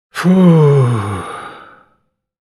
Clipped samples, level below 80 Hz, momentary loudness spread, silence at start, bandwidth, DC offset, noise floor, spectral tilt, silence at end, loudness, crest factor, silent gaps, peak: under 0.1%; -54 dBFS; 20 LU; 0.15 s; 12 kHz; under 0.1%; -62 dBFS; -8.5 dB/octave; 0.9 s; -11 LUFS; 14 dB; none; 0 dBFS